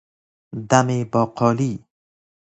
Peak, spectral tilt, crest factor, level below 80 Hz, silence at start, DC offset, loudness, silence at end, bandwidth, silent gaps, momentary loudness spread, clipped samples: 0 dBFS; -6 dB/octave; 22 dB; -58 dBFS; 0.55 s; under 0.1%; -20 LUFS; 0.75 s; 8.4 kHz; none; 17 LU; under 0.1%